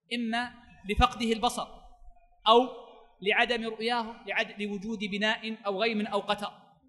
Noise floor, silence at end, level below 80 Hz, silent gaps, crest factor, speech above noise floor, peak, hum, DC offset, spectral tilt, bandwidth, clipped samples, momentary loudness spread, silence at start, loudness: -53 dBFS; 0.35 s; -48 dBFS; none; 24 dB; 24 dB; -6 dBFS; none; under 0.1%; -4 dB/octave; 12 kHz; under 0.1%; 12 LU; 0.1 s; -29 LUFS